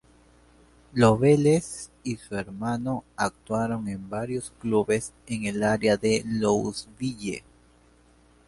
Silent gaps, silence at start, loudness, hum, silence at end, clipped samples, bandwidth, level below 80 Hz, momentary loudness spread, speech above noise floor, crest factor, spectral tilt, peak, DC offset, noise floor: none; 0.95 s; -26 LUFS; none; 1.1 s; under 0.1%; 11.5 kHz; -54 dBFS; 14 LU; 33 dB; 22 dB; -6 dB/octave; -6 dBFS; under 0.1%; -58 dBFS